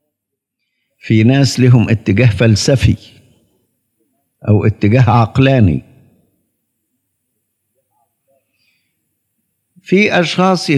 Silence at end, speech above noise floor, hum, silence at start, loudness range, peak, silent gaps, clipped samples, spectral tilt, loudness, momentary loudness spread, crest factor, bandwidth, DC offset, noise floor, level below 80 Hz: 0 s; 66 dB; none; 1.05 s; 6 LU; 0 dBFS; none; under 0.1%; -6.5 dB/octave; -12 LUFS; 6 LU; 14 dB; 12 kHz; under 0.1%; -77 dBFS; -42 dBFS